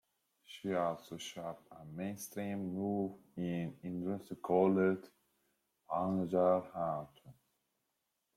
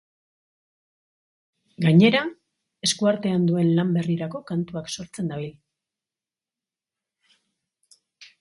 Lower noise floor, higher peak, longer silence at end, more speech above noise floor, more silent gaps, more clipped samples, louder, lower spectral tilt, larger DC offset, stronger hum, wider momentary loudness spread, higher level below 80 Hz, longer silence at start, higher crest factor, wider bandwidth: second, -85 dBFS vs under -90 dBFS; second, -18 dBFS vs -4 dBFS; first, 1.05 s vs 0.15 s; second, 49 dB vs over 68 dB; neither; neither; second, -37 LUFS vs -22 LUFS; first, -7 dB/octave vs -5.5 dB/octave; neither; neither; about the same, 14 LU vs 16 LU; second, -76 dBFS vs -66 dBFS; second, 0.5 s vs 1.8 s; about the same, 20 dB vs 22 dB; first, 16 kHz vs 11.5 kHz